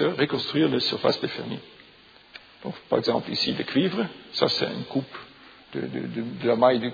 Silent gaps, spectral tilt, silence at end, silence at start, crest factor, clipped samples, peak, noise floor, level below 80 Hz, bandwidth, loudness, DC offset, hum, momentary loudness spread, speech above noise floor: none; -6 dB/octave; 0 s; 0 s; 22 dB; under 0.1%; -4 dBFS; -53 dBFS; -66 dBFS; 5 kHz; -25 LUFS; under 0.1%; none; 16 LU; 28 dB